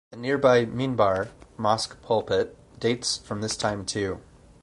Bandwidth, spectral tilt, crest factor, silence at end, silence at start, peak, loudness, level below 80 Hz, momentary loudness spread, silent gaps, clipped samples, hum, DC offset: 11.5 kHz; -4.5 dB/octave; 20 dB; 0.4 s; 0.1 s; -6 dBFS; -25 LUFS; -52 dBFS; 9 LU; none; under 0.1%; none; under 0.1%